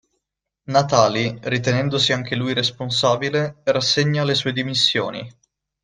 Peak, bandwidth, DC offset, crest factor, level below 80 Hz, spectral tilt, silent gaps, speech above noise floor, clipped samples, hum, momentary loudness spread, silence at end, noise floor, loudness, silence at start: -2 dBFS; 9.8 kHz; under 0.1%; 20 dB; -58 dBFS; -4.5 dB/octave; none; 59 dB; under 0.1%; none; 6 LU; 0.5 s; -79 dBFS; -19 LUFS; 0.7 s